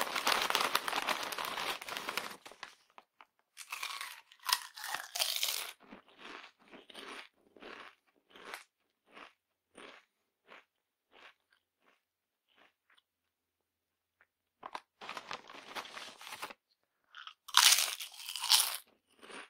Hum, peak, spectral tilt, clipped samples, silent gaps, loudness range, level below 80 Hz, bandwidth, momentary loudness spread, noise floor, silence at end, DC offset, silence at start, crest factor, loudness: none; -4 dBFS; 2 dB/octave; under 0.1%; none; 24 LU; -80 dBFS; 16 kHz; 26 LU; -88 dBFS; 0.05 s; under 0.1%; 0 s; 36 dB; -32 LUFS